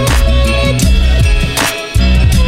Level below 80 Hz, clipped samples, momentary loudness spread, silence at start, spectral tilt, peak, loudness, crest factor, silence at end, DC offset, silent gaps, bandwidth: -12 dBFS; under 0.1%; 3 LU; 0 s; -4.5 dB/octave; 0 dBFS; -12 LUFS; 8 dB; 0 s; under 0.1%; none; 16 kHz